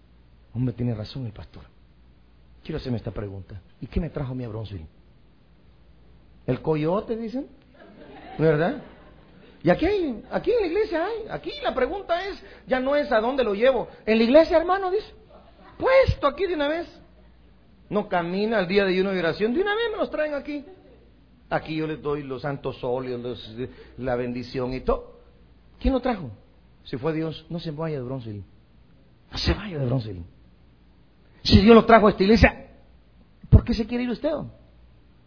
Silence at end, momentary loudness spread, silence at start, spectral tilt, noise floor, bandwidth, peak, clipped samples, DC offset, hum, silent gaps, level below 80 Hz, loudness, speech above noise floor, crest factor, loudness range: 0.75 s; 18 LU; 0.55 s; -7.5 dB/octave; -56 dBFS; 5.4 kHz; 0 dBFS; under 0.1%; under 0.1%; none; none; -38 dBFS; -24 LUFS; 33 dB; 24 dB; 13 LU